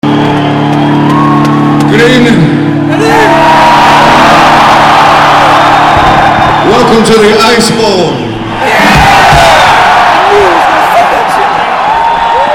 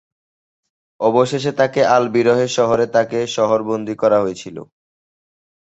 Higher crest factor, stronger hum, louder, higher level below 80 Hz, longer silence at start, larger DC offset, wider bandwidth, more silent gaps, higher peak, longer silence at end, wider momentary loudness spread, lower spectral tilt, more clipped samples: second, 4 dB vs 16 dB; neither; first, -4 LUFS vs -17 LUFS; first, -28 dBFS vs -58 dBFS; second, 0.05 s vs 1 s; first, 1% vs under 0.1%; first, 18 kHz vs 8.2 kHz; neither; about the same, 0 dBFS vs -2 dBFS; second, 0 s vs 1.15 s; second, 5 LU vs 9 LU; about the same, -5 dB/octave vs -5 dB/octave; first, 8% vs under 0.1%